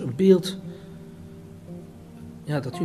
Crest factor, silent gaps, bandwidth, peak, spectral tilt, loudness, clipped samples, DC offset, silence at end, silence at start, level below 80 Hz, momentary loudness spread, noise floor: 20 dB; none; 14 kHz; -6 dBFS; -7 dB/octave; -22 LUFS; under 0.1%; under 0.1%; 0 s; 0 s; -60 dBFS; 24 LU; -43 dBFS